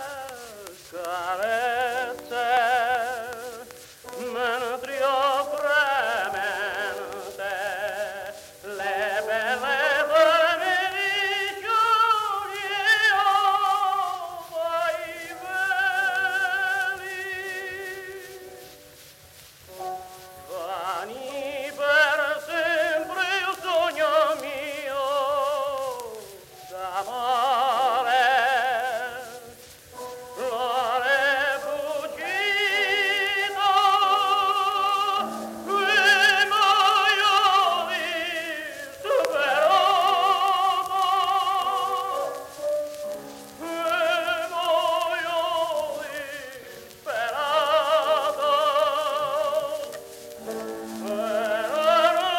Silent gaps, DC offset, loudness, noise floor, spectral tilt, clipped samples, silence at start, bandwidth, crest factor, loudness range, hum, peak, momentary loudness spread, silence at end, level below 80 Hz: none; under 0.1%; -23 LUFS; -49 dBFS; -1 dB/octave; under 0.1%; 0 s; 16 kHz; 20 dB; 7 LU; none; -6 dBFS; 18 LU; 0 s; -68 dBFS